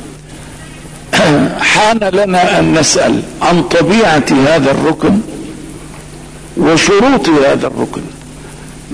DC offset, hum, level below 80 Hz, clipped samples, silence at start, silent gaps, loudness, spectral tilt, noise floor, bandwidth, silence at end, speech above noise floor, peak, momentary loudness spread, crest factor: under 0.1%; none; -36 dBFS; under 0.1%; 0 s; none; -10 LUFS; -4.5 dB/octave; -30 dBFS; 11 kHz; 0 s; 20 dB; -2 dBFS; 22 LU; 10 dB